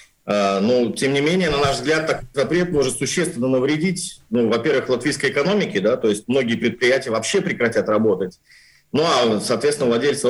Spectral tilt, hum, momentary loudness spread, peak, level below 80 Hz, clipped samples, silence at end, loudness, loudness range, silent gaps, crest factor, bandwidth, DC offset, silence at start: -4.5 dB/octave; none; 4 LU; -4 dBFS; -48 dBFS; under 0.1%; 0 s; -19 LUFS; 1 LU; none; 14 dB; 12.5 kHz; under 0.1%; 0.25 s